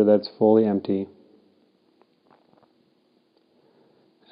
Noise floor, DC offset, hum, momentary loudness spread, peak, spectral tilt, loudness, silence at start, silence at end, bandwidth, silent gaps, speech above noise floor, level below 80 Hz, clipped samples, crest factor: -65 dBFS; under 0.1%; none; 10 LU; -6 dBFS; -11 dB/octave; -21 LUFS; 0 s; 3.25 s; 5.2 kHz; none; 45 dB; -80 dBFS; under 0.1%; 20 dB